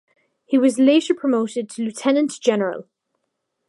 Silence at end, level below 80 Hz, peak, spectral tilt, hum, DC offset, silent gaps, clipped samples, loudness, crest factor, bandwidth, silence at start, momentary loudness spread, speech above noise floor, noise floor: 0.85 s; -76 dBFS; -4 dBFS; -4.5 dB/octave; none; under 0.1%; none; under 0.1%; -19 LUFS; 16 dB; 11.5 kHz; 0.5 s; 11 LU; 57 dB; -76 dBFS